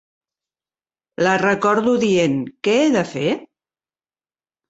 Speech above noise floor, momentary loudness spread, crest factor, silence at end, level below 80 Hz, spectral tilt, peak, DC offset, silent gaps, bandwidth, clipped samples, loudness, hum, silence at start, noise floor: over 73 dB; 6 LU; 18 dB; 1.25 s; -62 dBFS; -5 dB/octave; -2 dBFS; under 0.1%; none; 8.2 kHz; under 0.1%; -18 LUFS; none; 1.2 s; under -90 dBFS